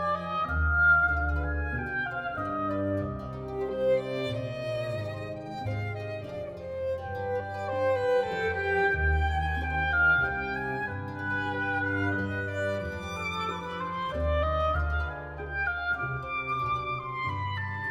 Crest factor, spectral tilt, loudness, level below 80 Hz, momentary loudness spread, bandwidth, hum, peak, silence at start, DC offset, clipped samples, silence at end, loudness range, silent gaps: 16 dB; -7 dB/octave; -29 LUFS; -38 dBFS; 10 LU; 9.2 kHz; none; -14 dBFS; 0 s; under 0.1%; under 0.1%; 0 s; 6 LU; none